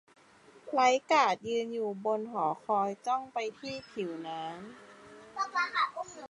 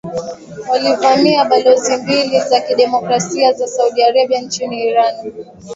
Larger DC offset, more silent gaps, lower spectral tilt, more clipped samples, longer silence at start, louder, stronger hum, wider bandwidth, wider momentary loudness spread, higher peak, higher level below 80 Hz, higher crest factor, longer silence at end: neither; neither; about the same, -3.5 dB/octave vs -3.5 dB/octave; neither; first, 0.55 s vs 0.05 s; second, -31 LUFS vs -14 LUFS; neither; first, 11.5 kHz vs 8 kHz; first, 18 LU vs 14 LU; second, -12 dBFS vs 0 dBFS; second, -78 dBFS vs -58 dBFS; first, 20 dB vs 14 dB; about the same, 0.05 s vs 0 s